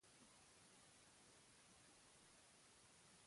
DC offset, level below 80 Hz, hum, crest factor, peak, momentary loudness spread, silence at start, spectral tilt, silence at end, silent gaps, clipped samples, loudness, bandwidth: under 0.1%; -88 dBFS; none; 14 dB; -58 dBFS; 1 LU; 0 s; -2 dB/octave; 0 s; none; under 0.1%; -68 LUFS; 11.5 kHz